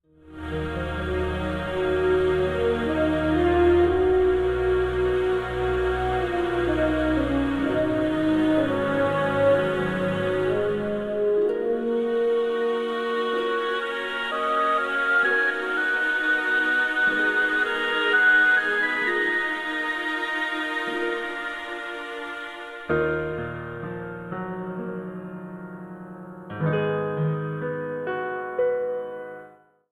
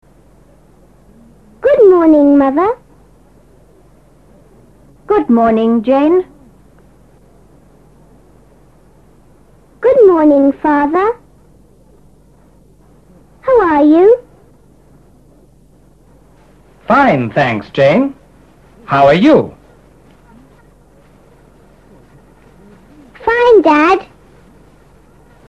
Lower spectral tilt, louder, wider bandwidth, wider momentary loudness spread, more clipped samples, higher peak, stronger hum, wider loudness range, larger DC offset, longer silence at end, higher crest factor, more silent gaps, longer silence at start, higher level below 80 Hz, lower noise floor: about the same, -6.5 dB/octave vs -7.5 dB/octave; second, -24 LUFS vs -10 LUFS; first, 12 kHz vs 7.6 kHz; first, 13 LU vs 10 LU; neither; second, -10 dBFS vs 0 dBFS; neither; first, 9 LU vs 5 LU; second, under 0.1% vs 0.2%; second, 0.45 s vs 1.45 s; about the same, 14 dB vs 14 dB; neither; second, 0.25 s vs 1.6 s; about the same, -42 dBFS vs -46 dBFS; first, -50 dBFS vs -46 dBFS